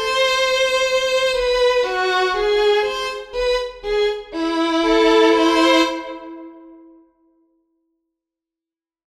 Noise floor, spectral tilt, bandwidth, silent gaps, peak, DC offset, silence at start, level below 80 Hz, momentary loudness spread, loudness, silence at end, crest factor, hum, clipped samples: -90 dBFS; -2 dB/octave; 14 kHz; none; -4 dBFS; under 0.1%; 0 s; -44 dBFS; 11 LU; -17 LUFS; 2.3 s; 16 dB; none; under 0.1%